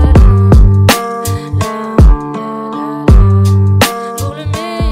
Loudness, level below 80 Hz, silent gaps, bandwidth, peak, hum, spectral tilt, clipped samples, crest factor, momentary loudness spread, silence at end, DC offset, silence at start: -11 LUFS; -12 dBFS; none; 16.5 kHz; 0 dBFS; none; -6 dB/octave; 2%; 8 dB; 12 LU; 0 s; under 0.1%; 0 s